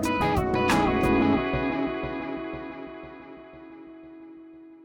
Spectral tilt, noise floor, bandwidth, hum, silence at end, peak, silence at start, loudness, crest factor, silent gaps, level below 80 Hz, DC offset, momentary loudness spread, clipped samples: -6 dB/octave; -47 dBFS; 19 kHz; none; 0 s; -12 dBFS; 0 s; -25 LUFS; 14 dB; none; -42 dBFS; under 0.1%; 23 LU; under 0.1%